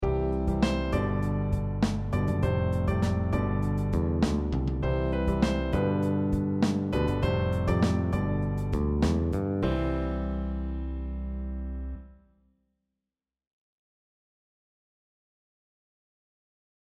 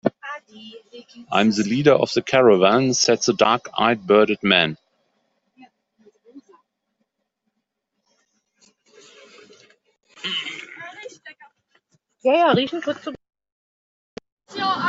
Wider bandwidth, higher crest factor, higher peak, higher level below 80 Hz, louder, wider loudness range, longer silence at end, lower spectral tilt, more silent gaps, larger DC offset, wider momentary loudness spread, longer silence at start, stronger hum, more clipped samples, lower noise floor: first, 12.5 kHz vs 8 kHz; about the same, 18 dB vs 22 dB; second, -10 dBFS vs 0 dBFS; first, -36 dBFS vs -64 dBFS; second, -28 LUFS vs -19 LUFS; second, 11 LU vs 16 LU; first, 4.8 s vs 0 s; first, -8 dB/octave vs -4 dB/octave; second, none vs 13.52-14.17 s, 14.32-14.37 s; neither; second, 8 LU vs 20 LU; about the same, 0 s vs 0.05 s; neither; neither; first, -90 dBFS vs -77 dBFS